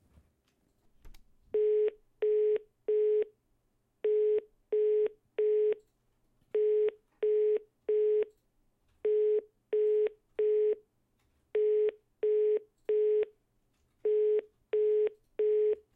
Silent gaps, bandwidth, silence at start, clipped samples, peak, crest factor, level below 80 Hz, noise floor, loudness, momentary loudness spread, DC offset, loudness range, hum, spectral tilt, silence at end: none; 3.6 kHz; 1.05 s; under 0.1%; -20 dBFS; 10 dB; -70 dBFS; -75 dBFS; -31 LUFS; 7 LU; under 0.1%; 1 LU; none; -6.5 dB/octave; 0.15 s